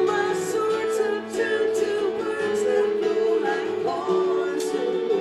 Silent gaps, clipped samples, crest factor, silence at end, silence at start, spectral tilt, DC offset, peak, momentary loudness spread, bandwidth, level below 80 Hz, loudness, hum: none; under 0.1%; 12 dB; 0 s; 0 s; -4 dB/octave; under 0.1%; -10 dBFS; 3 LU; 13.5 kHz; -66 dBFS; -24 LUFS; none